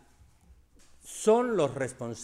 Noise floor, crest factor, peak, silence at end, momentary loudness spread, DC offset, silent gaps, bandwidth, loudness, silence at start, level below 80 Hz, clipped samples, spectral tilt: -59 dBFS; 18 dB; -12 dBFS; 0 s; 10 LU; under 0.1%; none; 13.5 kHz; -28 LUFS; 1.05 s; -62 dBFS; under 0.1%; -5 dB/octave